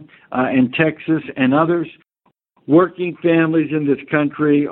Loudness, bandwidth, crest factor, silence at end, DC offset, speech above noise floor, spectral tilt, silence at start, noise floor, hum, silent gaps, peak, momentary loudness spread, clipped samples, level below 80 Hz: -17 LUFS; 4.1 kHz; 16 dB; 0 s; under 0.1%; 48 dB; -11 dB/octave; 0 s; -65 dBFS; none; none; 0 dBFS; 6 LU; under 0.1%; -60 dBFS